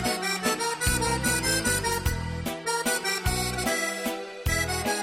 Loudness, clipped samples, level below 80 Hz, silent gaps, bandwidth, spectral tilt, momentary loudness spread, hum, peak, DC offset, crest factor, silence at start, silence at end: -26 LUFS; under 0.1%; -38 dBFS; none; 16 kHz; -3 dB/octave; 7 LU; none; -12 dBFS; under 0.1%; 16 dB; 0 s; 0 s